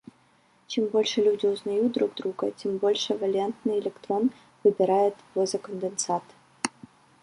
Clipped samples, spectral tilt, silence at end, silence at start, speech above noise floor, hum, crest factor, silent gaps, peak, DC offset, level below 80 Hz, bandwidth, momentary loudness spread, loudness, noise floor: under 0.1%; -4 dB/octave; 0.55 s; 0.7 s; 37 dB; none; 22 dB; none; -6 dBFS; under 0.1%; -74 dBFS; 11 kHz; 9 LU; -27 LUFS; -62 dBFS